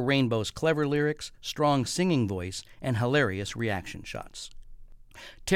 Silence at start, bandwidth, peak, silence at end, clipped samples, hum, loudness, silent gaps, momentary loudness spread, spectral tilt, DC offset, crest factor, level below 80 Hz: 0 s; 16.5 kHz; -10 dBFS; 0 s; under 0.1%; none; -28 LUFS; none; 15 LU; -5.5 dB/octave; under 0.1%; 18 dB; -52 dBFS